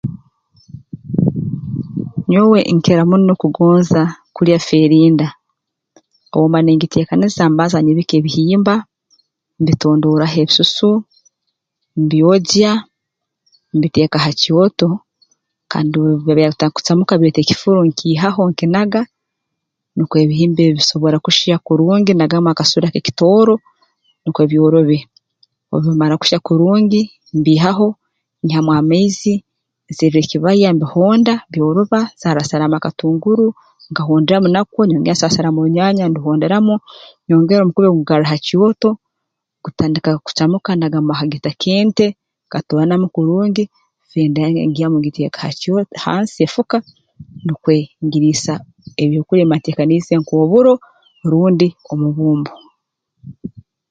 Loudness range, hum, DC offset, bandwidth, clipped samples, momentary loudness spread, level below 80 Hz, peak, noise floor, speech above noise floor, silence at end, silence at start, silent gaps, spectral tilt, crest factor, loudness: 4 LU; none; under 0.1%; 7.8 kHz; under 0.1%; 10 LU; -52 dBFS; 0 dBFS; -77 dBFS; 64 dB; 0.3 s; 0.05 s; none; -6.5 dB/octave; 14 dB; -14 LUFS